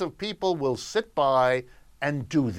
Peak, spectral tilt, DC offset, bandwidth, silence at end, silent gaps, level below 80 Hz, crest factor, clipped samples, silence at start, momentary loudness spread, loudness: -10 dBFS; -5.5 dB/octave; under 0.1%; 14.5 kHz; 0 s; none; -56 dBFS; 16 dB; under 0.1%; 0 s; 8 LU; -26 LUFS